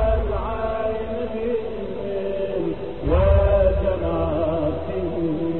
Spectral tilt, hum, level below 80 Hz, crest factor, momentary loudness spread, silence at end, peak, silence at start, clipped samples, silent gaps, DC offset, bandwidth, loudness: -11 dB/octave; none; -28 dBFS; 16 dB; 10 LU; 0 s; -6 dBFS; 0 s; under 0.1%; none; 2%; 4.3 kHz; -23 LUFS